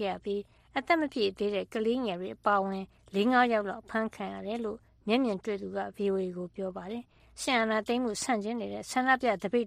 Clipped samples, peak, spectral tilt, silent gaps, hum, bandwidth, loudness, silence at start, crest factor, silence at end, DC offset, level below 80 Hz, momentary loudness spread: under 0.1%; -12 dBFS; -4.5 dB/octave; none; none; 14.5 kHz; -31 LUFS; 0 s; 18 dB; 0 s; under 0.1%; -64 dBFS; 11 LU